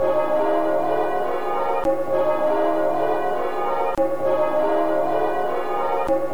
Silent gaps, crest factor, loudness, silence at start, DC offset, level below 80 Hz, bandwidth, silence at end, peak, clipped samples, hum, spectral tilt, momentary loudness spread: none; 12 dB; -22 LUFS; 0 s; 4%; -52 dBFS; over 20 kHz; 0 s; -8 dBFS; under 0.1%; none; -6 dB/octave; 4 LU